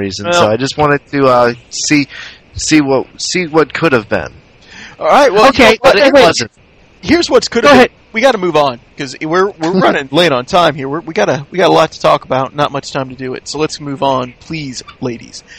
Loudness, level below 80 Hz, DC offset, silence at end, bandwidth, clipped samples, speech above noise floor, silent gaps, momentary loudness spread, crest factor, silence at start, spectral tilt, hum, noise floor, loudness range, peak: -11 LUFS; -42 dBFS; under 0.1%; 0.05 s; 16 kHz; 0.5%; 24 dB; none; 16 LU; 12 dB; 0 s; -4 dB/octave; none; -35 dBFS; 5 LU; 0 dBFS